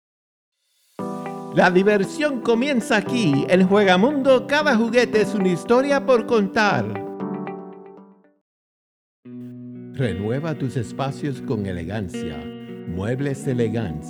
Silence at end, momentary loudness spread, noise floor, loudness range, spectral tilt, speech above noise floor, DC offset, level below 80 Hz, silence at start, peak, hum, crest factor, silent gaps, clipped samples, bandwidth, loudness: 0 s; 17 LU; -48 dBFS; 12 LU; -6 dB/octave; 28 dB; under 0.1%; -54 dBFS; 1 s; -2 dBFS; none; 18 dB; 8.41-9.23 s; under 0.1%; 13 kHz; -20 LUFS